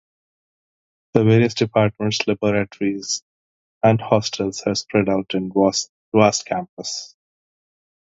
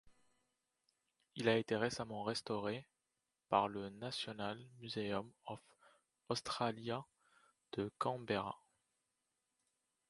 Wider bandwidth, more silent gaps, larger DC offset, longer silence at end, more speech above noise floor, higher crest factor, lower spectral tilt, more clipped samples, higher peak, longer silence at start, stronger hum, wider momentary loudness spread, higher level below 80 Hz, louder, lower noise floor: second, 7.8 kHz vs 11.5 kHz; first, 3.22-3.81 s, 5.89-6.12 s, 6.69-6.77 s vs none; neither; second, 1.05 s vs 1.55 s; first, over 71 dB vs 48 dB; about the same, 20 dB vs 24 dB; about the same, -5 dB/octave vs -5 dB/octave; neither; first, 0 dBFS vs -18 dBFS; first, 1.15 s vs 0.05 s; neither; second, 10 LU vs 14 LU; first, -54 dBFS vs -76 dBFS; first, -20 LUFS vs -41 LUFS; about the same, under -90 dBFS vs -89 dBFS